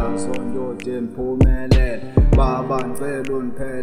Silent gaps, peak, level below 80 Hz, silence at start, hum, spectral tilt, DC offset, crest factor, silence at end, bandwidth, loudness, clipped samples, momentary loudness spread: none; -2 dBFS; -22 dBFS; 0 s; none; -7.5 dB/octave; under 0.1%; 16 dB; 0 s; 13.5 kHz; -21 LUFS; under 0.1%; 10 LU